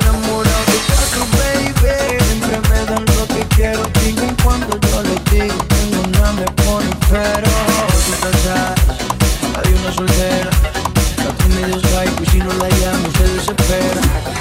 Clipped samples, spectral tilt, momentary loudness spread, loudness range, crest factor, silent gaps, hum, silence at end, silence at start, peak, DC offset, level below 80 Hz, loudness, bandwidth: under 0.1%; -4.5 dB/octave; 2 LU; 1 LU; 14 dB; none; none; 0 s; 0 s; 0 dBFS; under 0.1%; -18 dBFS; -15 LUFS; 16.5 kHz